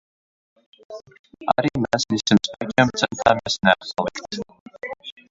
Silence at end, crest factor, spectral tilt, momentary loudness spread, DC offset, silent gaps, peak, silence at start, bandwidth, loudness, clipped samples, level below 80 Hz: 0.2 s; 22 dB; -4.5 dB/octave; 19 LU; under 0.1%; 1.19-1.24 s, 4.60-4.66 s; 0 dBFS; 0.9 s; 7.8 kHz; -21 LUFS; under 0.1%; -54 dBFS